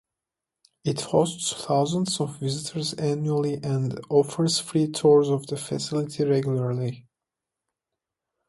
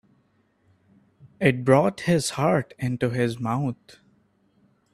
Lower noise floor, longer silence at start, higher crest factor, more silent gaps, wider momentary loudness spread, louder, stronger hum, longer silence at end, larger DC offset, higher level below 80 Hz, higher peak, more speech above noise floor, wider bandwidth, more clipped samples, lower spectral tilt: first, -88 dBFS vs -65 dBFS; second, 0.85 s vs 1.25 s; about the same, 18 dB vs 22 dB; neither; about the same, 9 LU vs 9 LU; about the same, -25 LUFS vs -23 LUFS; neither; first, 1.5 s vs 1.2 s; neither; about the same, -64 dBFS vs -60 dBFS; about the same, -6 dBFS vs -4 dBFS; first, 63 dB vs 43 dB; second, 11.5 kHz vs 13.5 kHz; neither; about the same, -5.5 dB/octave vs -6 dB/octave